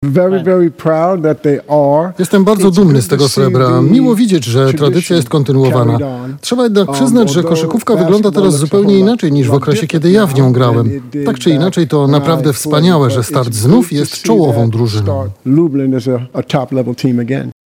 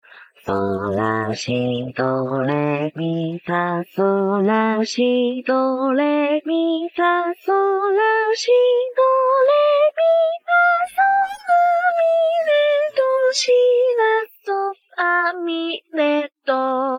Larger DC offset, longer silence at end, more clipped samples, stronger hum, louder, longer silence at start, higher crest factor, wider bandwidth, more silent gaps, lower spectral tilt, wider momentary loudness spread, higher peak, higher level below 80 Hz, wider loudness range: neither; first, 0.15 s vs 0 s; first, 0.1% vs under 0.1%; neither; first, -11 LUFS vs -18 LUFS; second, 0 s vs 0.15 s; about the same, 10 dB vs 12 dB; about the same, 17 kHz vs 16 kHz; neither; first, -6.5 dB/octave vs -5 dB/octave; about the same, 6 LU vs 8 LU; first, 0 dBFS vs -6 dBFS; first, -50 dBFS vs -68 dBFS; second, 2 LU vs 5 LU